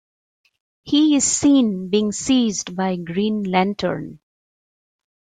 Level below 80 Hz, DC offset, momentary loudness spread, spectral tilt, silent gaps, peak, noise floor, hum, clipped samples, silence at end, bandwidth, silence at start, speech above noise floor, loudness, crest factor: -56 dBFS; under 0.1%; 9 LU; -4 dB/octave; none; -4 dBFS; under -90 dBFS; none; under 0.1%; 1.1 s; 9.6 kHz; 0.85 s; over 71 dB; -19 LUFS; 16 dB